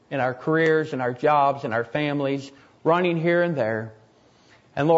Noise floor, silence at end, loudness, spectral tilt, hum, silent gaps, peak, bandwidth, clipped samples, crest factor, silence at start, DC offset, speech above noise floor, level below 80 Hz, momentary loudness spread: -56 dBFS; 0 s; -23 LUFS; -7.5 dB/octave; none; none; -6 dBFS; 7.8 kHz; under 0.1%; 16 dB; 0.1 s; under 0.1%; 34 dB; -68 dBFS; 11 LU